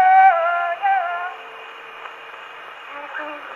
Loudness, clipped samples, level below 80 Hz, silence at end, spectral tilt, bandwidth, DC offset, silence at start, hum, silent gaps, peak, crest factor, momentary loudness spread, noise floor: -19 LUFS; under 0.1%; -76 dBFS; 0 s; -2 dB/octave; 4.4 kHz; under 0.1%; 0 s; none; none; -4 dBFS; 16 dB; 22 LU; -37 dBFS